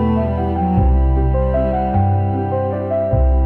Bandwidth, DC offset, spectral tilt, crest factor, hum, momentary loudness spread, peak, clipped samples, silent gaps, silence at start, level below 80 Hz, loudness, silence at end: 3.3 kHz; under 0.1%; -12 dB/octave; 10 dB; none; 4 LU; -4 dBFS; under 0.1%; none; 0 s; -20 dBFS; -17 LUFS; 0 s